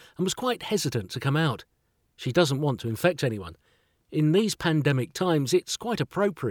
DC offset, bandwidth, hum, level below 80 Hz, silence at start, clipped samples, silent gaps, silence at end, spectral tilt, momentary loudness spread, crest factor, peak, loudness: under 0.1%; 19 kHz; none; -60 dBFS; 0.2 s; under 0.1%; none; 0 s; -5.5 dB/octave; 7 LU; 18 dB; -8 dBFS; -26 LUFS